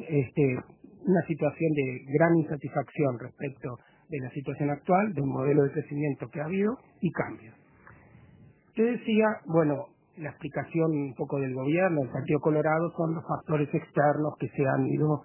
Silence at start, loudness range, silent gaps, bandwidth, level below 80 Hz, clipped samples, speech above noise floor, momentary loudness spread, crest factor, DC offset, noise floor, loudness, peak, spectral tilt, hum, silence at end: 0 s; 3 LU; none; 3.2 kHz; -64 dBFS; under 0.1%; 29 dB; 11 LU; 20 dB; under 0.1%; -56 dBFS; -28 LUFS; -8 dBFS; -12 dB/octave; none; 0 s